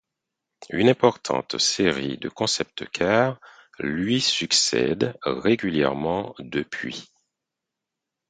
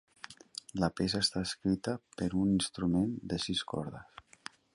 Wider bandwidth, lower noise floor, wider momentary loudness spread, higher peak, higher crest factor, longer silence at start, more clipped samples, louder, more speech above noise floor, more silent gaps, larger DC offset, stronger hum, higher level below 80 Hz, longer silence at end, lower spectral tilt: second, 9.6 kHz vs 11.5 kHz; first, -85 dBFS vs -53 dBFS; second, 12 LU vs 19 LU; first, -2 dBFS vs -16 dBFS; about the same, 22 dB vs 18 dB; first, 0.6 s vs 0.3 s; neither; first, -23 LUFS vs -33 LUFS; first, 62 dB vs 20 dB; neither; neither; neither; about the same, -56 dBFS vs -56 dBFS; first, 1.25 s vs 0.55 s; second, -3.5 dB/octave vs -5 dB/octave